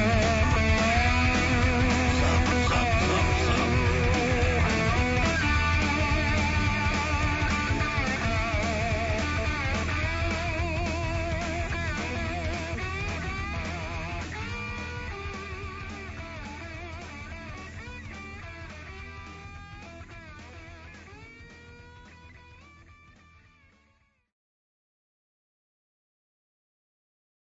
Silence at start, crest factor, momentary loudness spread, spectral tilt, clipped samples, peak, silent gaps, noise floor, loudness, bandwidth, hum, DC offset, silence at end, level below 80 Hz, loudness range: 0 s; 16 dB; 20 LU; -5 dB/octave; under 0.1%; -12 dBFS; none; -67 dBFS; -26 LUFS; 8 kHz; none; under 0.1%; 4.5 s; -34 dBFS; 20 LU